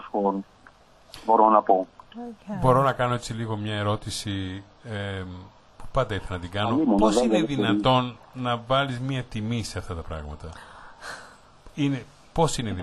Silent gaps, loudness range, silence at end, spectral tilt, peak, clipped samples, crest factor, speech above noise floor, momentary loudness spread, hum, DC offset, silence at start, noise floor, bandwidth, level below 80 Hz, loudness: none; 7 LU; 0 s; -6 dB/octave; -4 dBFS; under 0.1%; 22 dB; 29 dB; 19 LU; none; under 0.1%; 0 s; -53 dBFS; 12 kHz; -46 dBFS; -25 LUFS